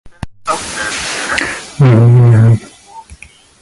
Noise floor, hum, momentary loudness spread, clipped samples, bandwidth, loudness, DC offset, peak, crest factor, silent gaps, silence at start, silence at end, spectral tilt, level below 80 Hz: -38 dBFS; none; 13 LU; under 0.1%; 11.5 kHz; -11 LUFS; under 0.1%; 0 dBFS; 12 dB; none; 0.05 s; 0.45 s; -6 dB/octave; -38 dBFS